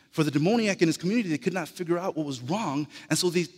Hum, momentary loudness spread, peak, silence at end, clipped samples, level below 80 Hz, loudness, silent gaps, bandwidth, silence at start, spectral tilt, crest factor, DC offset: none; 7 LU; -10 dBFS; 0.05 s; under 0.1%; -72 dBFS; -27 LUFS; none; 16 kHz; 0.15 s; -5 dB/octave; 18 dB; under 0.1%